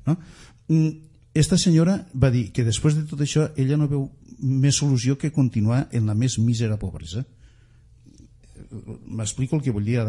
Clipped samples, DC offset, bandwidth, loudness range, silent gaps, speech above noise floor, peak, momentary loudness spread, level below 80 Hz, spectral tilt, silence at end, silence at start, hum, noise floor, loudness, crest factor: under 0.1%; under 0.1%; 11.5 kHz; 8 LU; none; 31 dB; -4 dBFS; 14 LU; -44 dBFS; -6 dB/octave; 0 s; 0.05 s; none; -52 dBFS; -22 LUFS; 20 dB